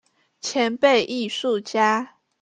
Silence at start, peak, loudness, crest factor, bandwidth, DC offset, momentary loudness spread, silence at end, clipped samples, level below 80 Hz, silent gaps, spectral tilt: 0.45 s; -6 dBFS; -21 LUFS; 18 dB; 9.6 kHz; under 0.1%; 10 LU; 0.35 s; under 0.1%; -70 dBFS; none; -3 dB/octave